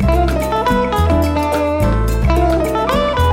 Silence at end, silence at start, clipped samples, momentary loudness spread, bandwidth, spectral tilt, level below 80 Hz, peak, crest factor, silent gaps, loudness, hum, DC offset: 0 s; 0 s; under 0.1%; 2 LU; 16.5 kHz; -6.5 dB/octave; -20 dBFS; 0 dBFS; 14 dB; none; -15 LUFS; none; under 0.1%